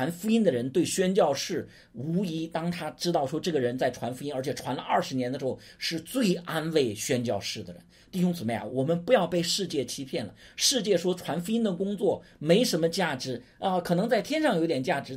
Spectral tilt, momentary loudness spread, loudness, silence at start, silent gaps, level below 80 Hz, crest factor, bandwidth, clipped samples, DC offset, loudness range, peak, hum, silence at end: -4.5 dB/octave; 9 LU; -28 LUFS; 0 s; none; -64 dBFS; 20 dB; 16 kHz; under 0.1%; under 0.1%; 3 LU; -8 dBFS; none; 0 s